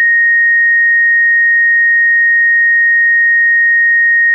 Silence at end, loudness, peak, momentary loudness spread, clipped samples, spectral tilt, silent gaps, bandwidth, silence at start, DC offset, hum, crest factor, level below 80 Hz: 0 s; -7 LUFS; -6 dBFS; 0 LU; under 0.1%; 21 dB/octave; none; 2 kHz; 0 s; under 0.1%; none; 4 dB; under -90 dBFS